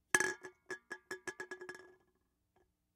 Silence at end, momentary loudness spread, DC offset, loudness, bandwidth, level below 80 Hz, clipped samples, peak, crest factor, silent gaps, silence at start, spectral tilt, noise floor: 1.05 s; 17 LU; under 0.1%; -41 LUFS; 17.5 kHz; -80 dBFS; under 0.1%; -12 dBFS; 32 dB; none; 0.15 s; -1 dB/octave; -80 dBFS